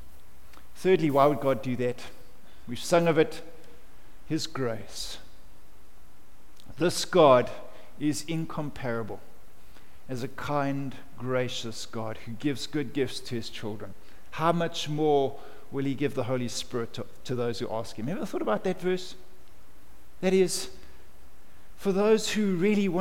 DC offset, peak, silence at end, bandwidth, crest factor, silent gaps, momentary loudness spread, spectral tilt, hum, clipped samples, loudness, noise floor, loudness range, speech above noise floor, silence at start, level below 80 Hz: 2%; -6 dBFS; 0 s; 17 kHz; 22 dB; none; 16 LU; -5 dB/octave; none; under 0.1%; -28 LUFS; -56 dBFS; 7 LU; 28 dB; 0 s; -56 dBFS